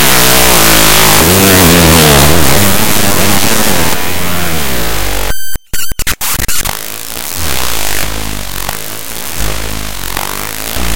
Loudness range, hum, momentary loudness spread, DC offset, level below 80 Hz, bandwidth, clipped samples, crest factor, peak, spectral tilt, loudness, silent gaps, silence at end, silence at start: 11 LU; none; 14 LU; under 0.1%; -24 dBFS; over 20 kHz; 2%; 10 dB; 0 dBFS; -3 dB/octave; -9 LUFS; none; 0 s; 0 s